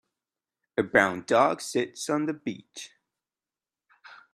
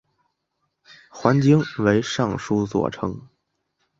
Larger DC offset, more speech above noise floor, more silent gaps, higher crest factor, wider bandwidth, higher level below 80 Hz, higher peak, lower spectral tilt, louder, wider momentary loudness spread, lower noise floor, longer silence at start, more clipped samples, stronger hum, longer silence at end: neither; first, over 64 dB vs 55 dB; neither; about the same, 24 dB vs 22 dB; first, 14 kHz vs 7.8 kHz; second, -68 dBFS vs -52 dBFS; second, -4 dBFS vs 0 dBFS; second, -4 dB/octave vs -6.5 dB/octave; second, -26 LUFS vs -21 LUFS; first, 19 LU vs 12 LU; first, under -90 dBFS vs -75 dBFS; second, 0.75 s vs 1.15 s; neither; neither; second, 0.2 s vs 0.75 s